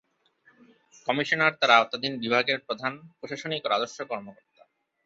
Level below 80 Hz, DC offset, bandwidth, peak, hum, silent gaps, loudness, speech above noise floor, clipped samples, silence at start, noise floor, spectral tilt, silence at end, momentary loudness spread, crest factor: -74 dBFS; under 0.1%; 8 kHz; -4 dBFS; none; none; -25 LUFS; 38 dB; under 0.1%; 1.05 s; -64 dBFS; -3.5 dB/octave; 0.75 s; 16 LU; 24 dB